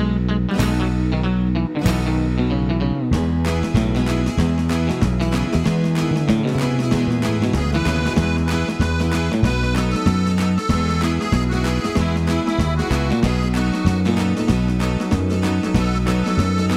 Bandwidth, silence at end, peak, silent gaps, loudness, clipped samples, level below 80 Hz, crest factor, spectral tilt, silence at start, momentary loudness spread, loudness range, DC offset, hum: 15.5 kHz; 0 s; -2 dBFS; none; -19 LUFS; under 0.1%; -28 dBFS; 16 dB; -6.5 dB/octave; 0 s; 1 LU; 1 LU; under 0.1%; none